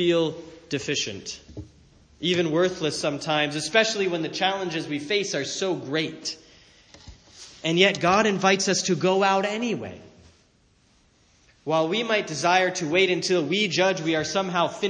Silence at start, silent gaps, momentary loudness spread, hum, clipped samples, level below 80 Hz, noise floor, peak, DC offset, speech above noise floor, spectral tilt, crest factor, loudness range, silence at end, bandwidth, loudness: 0 s; none; 13 LU; none; under 0.1%; -60 dBFS; -61 dBFS; -4 dBFS; under 0.1%; 38 dB; -3.5 dB/octave; 22 dB; 5 LU; 0 s; 10 kHz; -23 LUFS